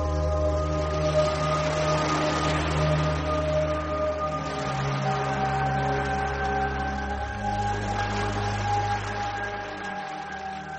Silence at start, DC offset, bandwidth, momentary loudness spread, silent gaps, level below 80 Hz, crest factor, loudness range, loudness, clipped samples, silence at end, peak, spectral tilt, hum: 0 s; under 0.1%; 8.8 kHz; 7 LU; none; -36 dBFS; 14 dB; 4 LU; -27 LUFS; under 0.1%; 0 s; -12 dBFS; -5.5 dB/octave; none